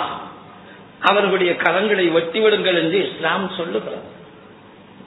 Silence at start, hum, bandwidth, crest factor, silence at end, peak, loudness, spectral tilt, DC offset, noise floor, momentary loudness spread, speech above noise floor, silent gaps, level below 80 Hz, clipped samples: 0 s; none; 4.1 kHz; 20 dB; 0.55 s; 0 dBFS; -18 LUFS; -7 dB/octave; under 0.1%; -44 dBFS; 14 LU; 25 dB; none; -64 dBFS; under 0.1%